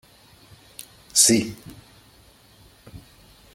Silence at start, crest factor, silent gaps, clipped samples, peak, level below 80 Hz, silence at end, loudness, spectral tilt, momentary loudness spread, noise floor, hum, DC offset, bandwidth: 1.15 s; 24 dB; none; under 0.1%; -2 dBFS; -58 dBFS; 0.55 s; -18 LUFS; -2 dB/octave; 27 LU; -53 dBFS; none; under 0.1%; 16.5 kHz